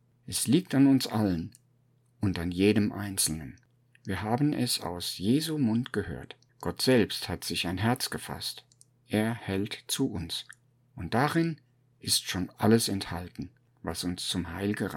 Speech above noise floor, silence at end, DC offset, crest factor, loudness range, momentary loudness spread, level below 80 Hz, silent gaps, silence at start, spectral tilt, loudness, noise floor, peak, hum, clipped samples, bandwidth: 38 dB; 0 s; under 0.1%; 20 dB; 4 LU; 15 LU; -56 dBFS; none; 0.25 s; -4.5 dB/octave; -29 LUFS; -66 dBFS; -10 dBFS; none; under 0.1%; 17.5 kHz